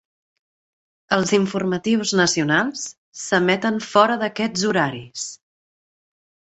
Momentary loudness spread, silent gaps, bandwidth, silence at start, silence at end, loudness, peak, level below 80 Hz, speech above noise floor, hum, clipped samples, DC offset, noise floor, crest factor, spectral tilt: 13 LU; 2.97-3.12 s; 8.2 kHz; 1.1 s; 1.15 s; -20 LUFS; -2 dBFS; -60 dBFS; over 70 dB; none; under 0.1%; under 0.1%; under -90 dBFS; 20 dB; -4 dB/octave